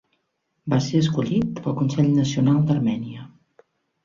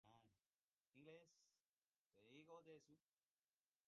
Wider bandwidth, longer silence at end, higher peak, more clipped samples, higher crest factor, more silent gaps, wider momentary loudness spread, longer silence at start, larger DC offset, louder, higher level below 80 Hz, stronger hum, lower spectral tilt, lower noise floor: about the same, 7.4 kHz vs 7.2 kHz; about the same, 0.75 s vs 0.85 s; first, -6 dBFS vs -50 dBFS; neither; about the same, 16 dB vs 20 dB; second, none vs 0.54-0.92 s, 1.60-1.82 s, 1.96-2.10 s; first, 12 LU vs 4 LU; first, 0.65 s vs 0.05 s; neither; first, -21 LUFS vs -67 LUFS; first, -56 dBFS vs under -90 dBFS; neither; first, -7 dB/octave vs -4 dB/octave; second, -74 dBFS vs under -90 dBFS